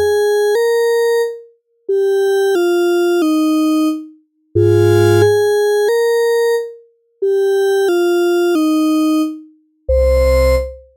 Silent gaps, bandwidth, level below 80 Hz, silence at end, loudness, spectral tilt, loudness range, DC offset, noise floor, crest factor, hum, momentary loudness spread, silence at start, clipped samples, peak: none; 17 kHz; -28 dBFS; 0.2 s; -14 LUFS; -6 dB/octave; 2 LU; under 0.1%; -44 dBFS; 14 dB; none; 9 LU; 0 s; under 0.1%; 0 dBFS